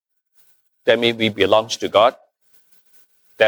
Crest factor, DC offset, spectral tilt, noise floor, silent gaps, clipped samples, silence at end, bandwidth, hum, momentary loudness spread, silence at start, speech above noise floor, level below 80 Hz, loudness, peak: 18 dB; under 0.1%; -4 dB/octave; -59 dBFS; none; under 0.1%; 0 s; over 20 kHz; none; 3 LU; 0.85 s; 42 dB; -66 dBFS; -17 LUFS; -2 dBFS